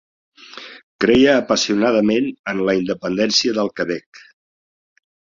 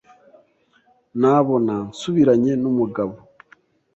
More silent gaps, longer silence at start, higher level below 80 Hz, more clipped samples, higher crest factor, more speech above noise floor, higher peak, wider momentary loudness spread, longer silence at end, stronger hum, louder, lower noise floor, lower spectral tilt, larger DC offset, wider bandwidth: first, 0.83-0.99 s, 2.39-2.44 s vs none; second, 0.55 s vs 1.15 s; first, -52 dBFS vs -60 dBFS; neither; about the same, 18 dB vs 18 dB; second, 21 dB vs 42 dB; about the same, -2 dBFS vs -4 dBFS; first, 22 LU vs 11 LU; first, 1.25 s vs 0.8 s; neither; about the same, -17 LUFS vs -19 LUFS; second, -39 dBFS vs -60 dBFS; second, -4 dB/octave vs -7.5 dB/octave; neither; about the same, 7.6 kHz vs 8.2 kHz